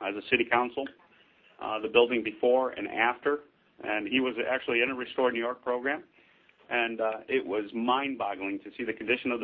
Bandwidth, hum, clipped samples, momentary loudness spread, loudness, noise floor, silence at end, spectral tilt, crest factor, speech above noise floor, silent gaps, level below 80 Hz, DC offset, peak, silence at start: 4.7 kHz; none; under 0.1%; 10 LU; -29 LUFS; -61 dBFS; 0 s; -7.5 dB/octave; 22 dB; 32 dB; none; -70 dBFS; under 0.1%; -8 dBFS; 0 s